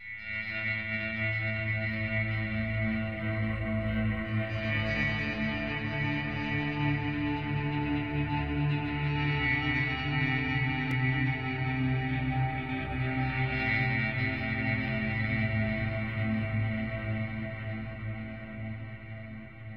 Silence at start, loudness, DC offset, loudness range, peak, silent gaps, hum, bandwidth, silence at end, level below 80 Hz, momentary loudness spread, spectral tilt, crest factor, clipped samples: 0 s; -31 LUFS; 0.2%; 3 LU; -16 dBFS; none; none; 6.2 kHz; 0 s; -46 dBFS; 8 LU; -8.5 dB/octave; 16 dB; under 0.1%